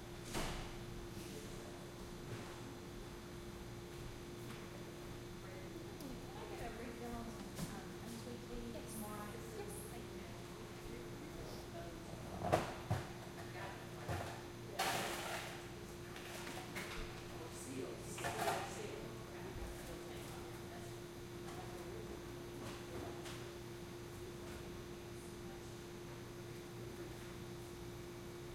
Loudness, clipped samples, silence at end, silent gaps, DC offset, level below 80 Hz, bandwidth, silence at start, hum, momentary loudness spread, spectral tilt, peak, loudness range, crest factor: -48 LUFS; under 0.1%; 0 s; none; under 0.1%; -60 dBFS; 16.5 kHz; 0 s; none; 8 LU; -4.5 dB/octave; -18 dBFS; 6 LU; 30 dB